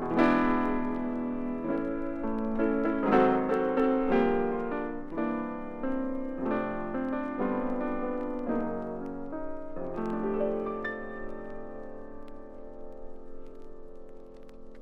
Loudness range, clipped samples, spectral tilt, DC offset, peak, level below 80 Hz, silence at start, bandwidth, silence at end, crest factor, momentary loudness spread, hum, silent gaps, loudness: 13 LU; under 0.1%; -8.5 dB/octave; under 0.1%; -10 dBFS; -46 dBFS; 0 s; 5.8 kHz; 0 s; 20 dB; 23 LU; none; none; -30 LUFS